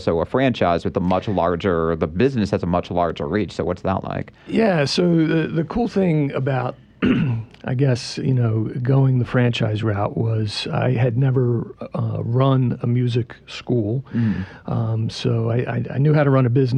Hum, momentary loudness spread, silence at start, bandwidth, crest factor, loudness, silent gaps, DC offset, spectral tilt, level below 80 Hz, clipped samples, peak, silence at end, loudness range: none; 7 LU; 0 s; 9.6 kHz; 14 dB; -20 LUFS; none; under 0.1%; -7.5 dB/octave; -46 dBFS; under 0.1%; -6 dBFS; 0 s; 2 LU